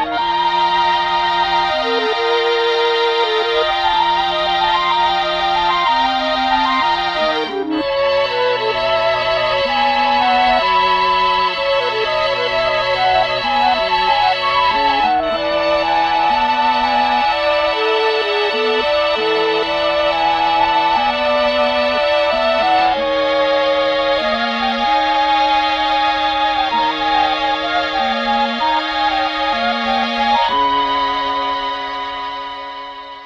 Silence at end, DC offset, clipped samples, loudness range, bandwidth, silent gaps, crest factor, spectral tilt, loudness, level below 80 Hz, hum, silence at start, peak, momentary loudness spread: 0 s; under 0.1%; under 0.1%; 2 LU; 9.4 kHz; none; 14 dB; -3.5 dB/octave; -15 LUFS; -44 dBFS; none; 0 s; -2 dBFS; 3 LU